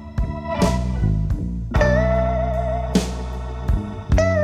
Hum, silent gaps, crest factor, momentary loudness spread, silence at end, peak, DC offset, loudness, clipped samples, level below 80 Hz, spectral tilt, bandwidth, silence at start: none; none; 16 dB; 8 LU; 0 s; -4 dBFS; under 0.1%; -22 LUFS; under 0.1%; -24 dBFS; -7 dB/octave; 13 kHz; 0 s